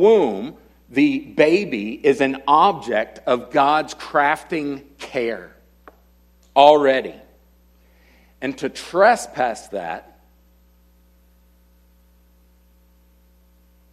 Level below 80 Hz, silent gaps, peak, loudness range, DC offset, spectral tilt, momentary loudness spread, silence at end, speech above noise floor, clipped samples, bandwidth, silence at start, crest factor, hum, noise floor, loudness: -56 dBFS; none; 0 dBFS; 5 LU; under 0.1%; -4.5 dB/octave; 15 LU; 3.9 s; 36 dB; under 0.1%; 14 kHz; 0 s; 20 dB; 60 Hz at -55 dBFS; -55 dBFS; -19 LUFS